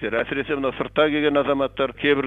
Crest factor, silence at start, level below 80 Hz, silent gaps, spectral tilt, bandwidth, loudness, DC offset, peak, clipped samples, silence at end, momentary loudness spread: 18 dB; 0 s; -48 dBFS; none; -7.5 dB/octave; 4.3 kHz; -22 LUFS; under 0.1%; -4 dBFS; under 0.1%; 0 s; 5 LU